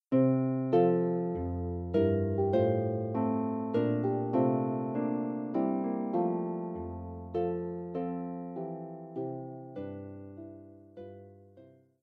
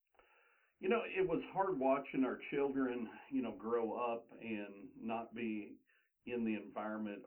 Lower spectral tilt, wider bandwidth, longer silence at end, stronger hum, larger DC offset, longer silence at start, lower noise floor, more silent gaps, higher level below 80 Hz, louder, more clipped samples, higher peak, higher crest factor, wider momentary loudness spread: first, -11.5 dB/octave vs -9 dB/octave; first, 4.6 kHz vs 3.8 kHz; first, 0.35 s vs 0 s; neither; neither; second, 0.1 s vs 0.8 s; second, -58 dBFS vs -73 dBFS; neither; first, -58 dBFS vs -76 dBFS; first, -32 LUFS vs -40 LUFS; neither; first, -14 dBFS vs -22 dBFS; about the same, 16 dB vs 18 dB; first, 18 LU vs 10 LU